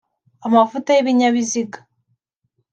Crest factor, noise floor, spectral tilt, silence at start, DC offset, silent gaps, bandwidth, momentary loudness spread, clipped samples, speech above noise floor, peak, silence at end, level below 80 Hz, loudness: 16 dB; -71 dBFS; -3.5 dB/octave; 0.45 s; under 0.1%; none; 8.8 kHz; 12 LU; under 0.1%; 54 dB; -2 dBFS; 0.95 s; -70 dBFS; -17 LUFS